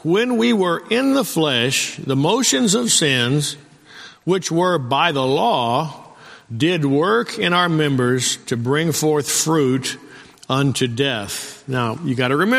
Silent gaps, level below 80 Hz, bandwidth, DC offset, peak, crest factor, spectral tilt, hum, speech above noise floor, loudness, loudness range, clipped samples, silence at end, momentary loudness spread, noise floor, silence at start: none; -58 dBFS; 15.5 kHz; under 0.1%; -2 dBFS; 16 dB; -4 dB/octave; none; 24 dB; -18 LUFS; 3 LU; under 0.1%; 0 s; 8 LU; -42 dBFS; 0.05 s